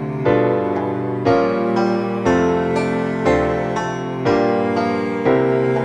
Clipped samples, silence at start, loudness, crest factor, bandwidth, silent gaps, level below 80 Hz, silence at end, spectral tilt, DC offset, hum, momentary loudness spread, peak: under 0.1%; 0 s; -18 LUFS; 14 dB; 9.6 kHz; none; -42 dBFS; 0 s; -7.5 dB/octave; under 0.1%; none; 5 LU; -2 dBFS